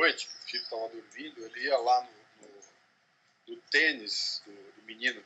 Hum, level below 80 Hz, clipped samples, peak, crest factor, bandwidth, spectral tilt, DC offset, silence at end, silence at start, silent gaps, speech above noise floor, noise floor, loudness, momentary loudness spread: none; under -90 dBFS; under 0.1%; -10 dBFS; 22 dB; 8.8 kHz; 0 dB/octave; under 0.1%; 0.05 s; 0 s; none; 37 dB; -69 dBFS; -30 LUFS; 23 LU